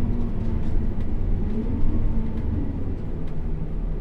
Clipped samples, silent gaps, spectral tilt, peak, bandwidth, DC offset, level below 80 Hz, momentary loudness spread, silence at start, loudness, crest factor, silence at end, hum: under 0.1%; none; -10.5 dB/octave; -10 dBFS; 3.3 kHz; under 0.1%; -24 dBFS; 5 LU; 0 s; -29 LUFS; 12 dB; 0 s; none